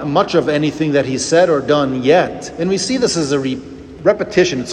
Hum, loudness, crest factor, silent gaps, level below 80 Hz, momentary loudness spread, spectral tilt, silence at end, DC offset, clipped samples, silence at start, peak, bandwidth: none; -15 LUFS; 14 dB; none; -48 dBFS; 8 LU; -4.5 dB/octave; 0 s; under 0.1%; under 0.1%; 0 s; 0 dBFS; 11 kHz